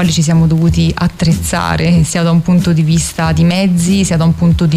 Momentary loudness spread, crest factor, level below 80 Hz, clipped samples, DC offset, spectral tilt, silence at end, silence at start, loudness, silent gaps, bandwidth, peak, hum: 3 LU; 8 dB; -28 dBFS; under 0.1%; under 0.1%; -6 dB/octave; 0 s; 0 s; -11 LUFS; none; 15 kHz; -4 dBFS; none